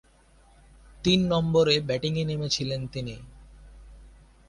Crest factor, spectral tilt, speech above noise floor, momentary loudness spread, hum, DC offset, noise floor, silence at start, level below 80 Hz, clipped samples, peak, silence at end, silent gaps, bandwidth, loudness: 20 dB; -5.5 dB/octave; 32 dB; 14 LU; none; under 0.1%; -57 dBFS; 1 s; -50 dBFS; under 0.1%; -8 dBFS; 0.4 s; none; 11.5 kHz; -25 LUFS